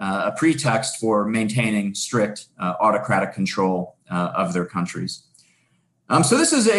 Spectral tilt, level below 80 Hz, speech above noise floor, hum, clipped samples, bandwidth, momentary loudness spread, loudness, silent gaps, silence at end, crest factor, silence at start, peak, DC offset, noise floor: -4.5 dB/octave; -62 dBFS; 44 dB; none; under 0.1%; 12.5 kHz; 10 LU; -21 LUFS; none; 0 s; 16 dB; 0 s; -4 dBFS; under 0.1%; -65 dBFS